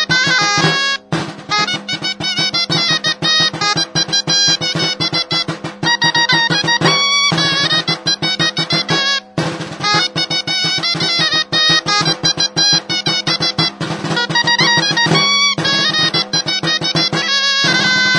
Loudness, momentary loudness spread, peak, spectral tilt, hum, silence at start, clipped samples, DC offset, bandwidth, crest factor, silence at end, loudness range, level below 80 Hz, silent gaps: -13 LUFS; 6 LU; 0 dBFS; -2.5 dB/octave; none; 0 s; under 0.1%; under 0.1%; 10.5 kHz; 16 dB; 0 s; 2 LU; -54 dBFS; none